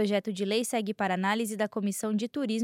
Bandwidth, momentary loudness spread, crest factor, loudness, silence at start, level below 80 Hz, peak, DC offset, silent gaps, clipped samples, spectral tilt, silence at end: 16 kHz; 3 LU; 14 dB; -30 LUFS; 0 s; -80 dBFS; -14 dBFS; under 0.1%; none; under 0.1%; -4.5 dB/octave; 0 s